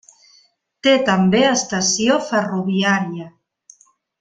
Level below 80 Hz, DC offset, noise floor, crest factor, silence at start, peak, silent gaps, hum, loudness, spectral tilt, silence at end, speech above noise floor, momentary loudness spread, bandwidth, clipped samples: -60 dBFS; under 0.1%; -57 dBFS; 18 dB; 0.85 s; -2 dBFS; none; none; -17 LUFS; -4 dB/octave; 0.9 s; 40 dB; 6 LU; 9.4 kHz; under 0.1%